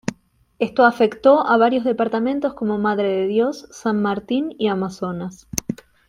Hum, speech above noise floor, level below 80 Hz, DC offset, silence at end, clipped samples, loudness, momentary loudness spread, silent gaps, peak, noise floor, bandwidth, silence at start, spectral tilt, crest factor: none; 30 dB; -54 dBFS; under 0.1%; 0.35 s; under 0.1%; -20 LUFS; 12 LU; none; 0 dBFS; -49 dBFS; 16 kHz; 0.05 s; -5 dB/octave; 20 dB